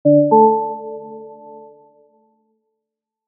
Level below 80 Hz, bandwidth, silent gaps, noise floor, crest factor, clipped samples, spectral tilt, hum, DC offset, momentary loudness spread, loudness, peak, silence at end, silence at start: -86 dBFS; 1.1 kHz; none; -82 dBFS; 18 dB; under 0.1%; -17.5 dB/octave; none; under 0.1%; 26 LU; -14 LUFS; 0 dBFS; 2 s; 0.05 s